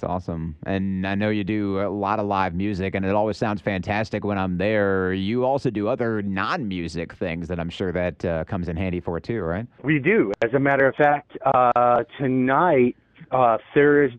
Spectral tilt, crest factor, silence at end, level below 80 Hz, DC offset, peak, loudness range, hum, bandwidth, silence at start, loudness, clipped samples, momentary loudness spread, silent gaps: -8 dB/octave; 16 dB; 0 s; -48 dBFS; under 0.1%; -6 dBFS; 7 LU; none; 9 kHz; 0 s; -22 LUFS; under 0.1%; 10 LU; none